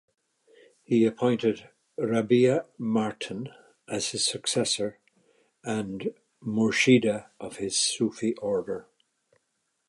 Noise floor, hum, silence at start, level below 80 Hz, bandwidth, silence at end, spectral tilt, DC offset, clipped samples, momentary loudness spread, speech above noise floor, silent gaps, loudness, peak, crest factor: -77 dBFS; none; 0.9 s; -68 dBFS; 11.5 kHz; 1.05 s; -4 dB/octave; under 0.1%; under 0.1%; 15 LU; 51 dB; none; -26 LUFS; -6 dBFS; 20 dB